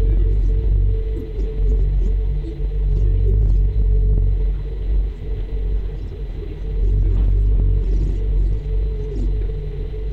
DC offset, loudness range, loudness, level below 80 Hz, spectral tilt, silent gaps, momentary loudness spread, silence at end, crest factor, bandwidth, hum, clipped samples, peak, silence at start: under 0.1%; 3 LU; -22 LUFS; -18 dBFS; -10 dB/octave; none; 9 LU; 0 s; 12 dB; 2.9 kHz; none; under 0.1%; -6 dBFS; 0 s